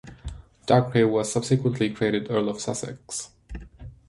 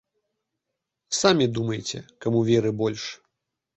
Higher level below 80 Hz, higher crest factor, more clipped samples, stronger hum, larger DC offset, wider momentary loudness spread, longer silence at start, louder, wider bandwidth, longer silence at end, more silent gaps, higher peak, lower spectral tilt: first, -46 dBFS vs -60 dBFS; about the same, 20 dB vs 22 dB; neither; neither; neither; first, 20 LU vs 13 LU; second, 0.05 s vs 1.1 s; about the same, -24 LUFS vs -24 LUFS; first, 11.5 kHz vs 8.2 kHz; second, 0.15 s vs 0.6 s; neither; about the same, -4 dBFS vs -4 dBFS; about the same, -5.5 dB/octave vs -5 dB/octave